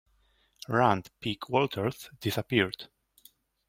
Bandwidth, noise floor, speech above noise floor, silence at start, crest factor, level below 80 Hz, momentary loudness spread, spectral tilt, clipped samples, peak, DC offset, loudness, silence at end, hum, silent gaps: 16.5 kHz; -68 dBFS; 39 dB; 0.7 s; 24 dB; -66 dBFS; 14 LU; -5.5 dB/octave; under 0.1%; -8 dBFS; under 0.1%; -29 LUFS; 0.85 s; none; none